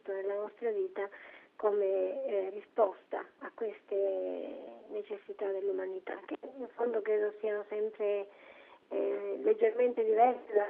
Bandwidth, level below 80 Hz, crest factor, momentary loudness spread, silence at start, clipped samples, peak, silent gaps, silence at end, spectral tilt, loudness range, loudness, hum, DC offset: 3.8 kHz; -88 dBFS; 20 dB; 14 LU; 0.05 s; under 0.1%; -14 dBFS; none; 0 s; -3 dB/octave; 5 LU; -34 LUFS; none; under 0.1%